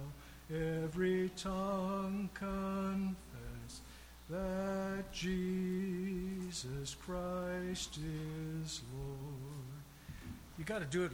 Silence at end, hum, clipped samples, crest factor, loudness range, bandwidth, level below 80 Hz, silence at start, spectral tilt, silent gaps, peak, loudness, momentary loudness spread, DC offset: 0 s; none; under 0.1%; 16 dB; 5 LU; 17 kHz; -56 dBFS; 0 s; -5.5 dB/octave; none; -24 dBFS; -41 LUFS; 13 LU; under 0.1%